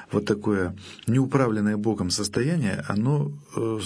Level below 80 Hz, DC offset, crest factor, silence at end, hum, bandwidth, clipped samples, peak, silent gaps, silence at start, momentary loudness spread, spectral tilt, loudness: -56 dBFS; under 0.1%; 20 dB; 0 s; none; 11 kHz; under 0.1%; -6 dBFS; none; 0 s; 7 LU; -6 dB/octave; -25 LUFS